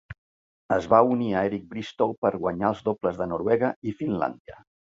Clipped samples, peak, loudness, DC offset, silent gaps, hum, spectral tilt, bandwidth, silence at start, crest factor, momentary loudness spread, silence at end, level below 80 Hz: under 0.1%; -4 dBFS; -25 LUFS; under 0.1%; 0.18-0.69 s, 2.18-2.22 s, 3.76-3.82 s, 4.40-4.45 s; none; -7.5 dB/octave; 7.6 kHz; 0.1 s; 22 dB; 11 LU; 0.35 s; -56 dBFS